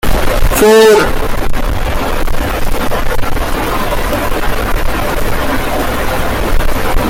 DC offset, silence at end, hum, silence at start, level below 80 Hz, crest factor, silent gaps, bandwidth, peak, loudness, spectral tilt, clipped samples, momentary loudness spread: under 0.1%; 0 s; none; 0.05 s; -16 dBFS; 10 dB; none; 17 kHz; 0 dBFS; -14 LUFS; -4.5 dB/octave; under 0.1%; 10 LU